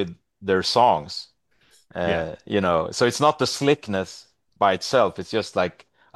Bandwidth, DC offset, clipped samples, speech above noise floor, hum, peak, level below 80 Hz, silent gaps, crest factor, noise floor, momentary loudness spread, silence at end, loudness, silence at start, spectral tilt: 12.5 kHz; under 0.1%; under 0.1%; 39 dB; none; -4 dBFS; -56 dBFS; none; 18 dB; -61 dBFS; 15 LU; 0.45 s; -22 LUFS; 0 s; -4.5 dB/octave